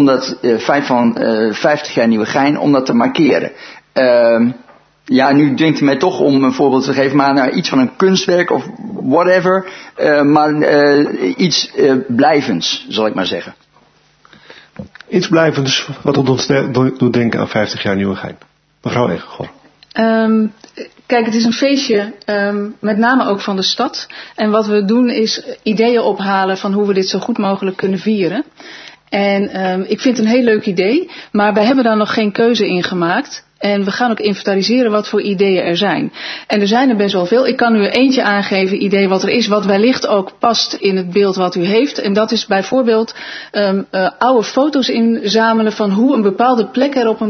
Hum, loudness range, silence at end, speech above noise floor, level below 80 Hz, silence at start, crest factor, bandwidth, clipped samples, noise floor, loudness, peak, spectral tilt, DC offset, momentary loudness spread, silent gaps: none; 4 LU; 0 s; 38 dB; -58 dBFS; 0 s; 14 dB; 6.6 kHz; under 0.1%; -51 dBFS; -13 LUFS; 0 dBFS; -5.5 dB/octave; under 0.1%; 8 LU; none